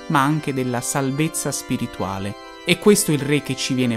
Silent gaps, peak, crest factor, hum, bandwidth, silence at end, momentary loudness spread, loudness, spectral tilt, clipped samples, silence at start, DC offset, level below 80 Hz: none; 0 dBFS; 20 dB; none; 16 kHz; 0 s; 11 LU; -21 LUFS; -4.5 dB/octave; under 0.1%; 0 s; under 0.1%; -52 dBFS